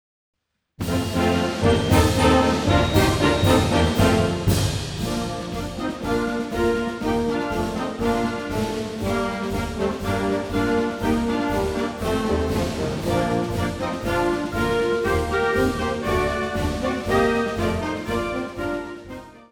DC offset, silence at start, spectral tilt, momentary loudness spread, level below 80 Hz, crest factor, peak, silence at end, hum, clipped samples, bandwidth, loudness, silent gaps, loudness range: under 0.1%; 0.8 s; -5.5 dB/octave; 9 LU; -34 dBFS; 18 dB; -4 dBFS; 0.1 s; none; under 0.1%; over 20 kHz; -22 LUFS; none; 6 LU